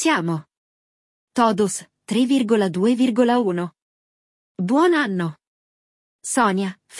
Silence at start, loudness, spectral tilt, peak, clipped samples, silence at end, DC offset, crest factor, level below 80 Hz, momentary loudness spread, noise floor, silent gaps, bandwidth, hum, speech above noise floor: 0 s; -20 LUFS; -5 dB/octave; -4 dBFS; under 0.1%; 0 s; under 0.1%; 16 dB; -70 dBFS; 12 LU; under -90 dBFS; 0.57-1.28 s, 3.82-4.55 s, 5.47-6.19 s; 12 kHz; none; over 71 dB